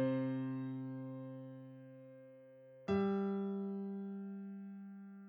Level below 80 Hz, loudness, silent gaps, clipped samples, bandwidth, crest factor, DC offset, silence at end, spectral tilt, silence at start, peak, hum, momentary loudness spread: -78 dBFS; -42 LUFS; none; under 0.1%; 6.6 kHz; 16 dB; under 0.1%; 0 s; -9.5 dB/octave; 0 s; -26 dBFS; none; 20 LU